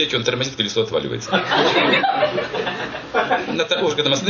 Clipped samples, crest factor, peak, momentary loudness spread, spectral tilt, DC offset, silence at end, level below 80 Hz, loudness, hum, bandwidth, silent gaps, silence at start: under 0.1%; 18 dB; -2 dBFS; 8 LU; -3.5 dB/octave; under 0.1%; 0 s; -54 dBFS; -19 LUFS; none; 7.2 kHz; none; 0 s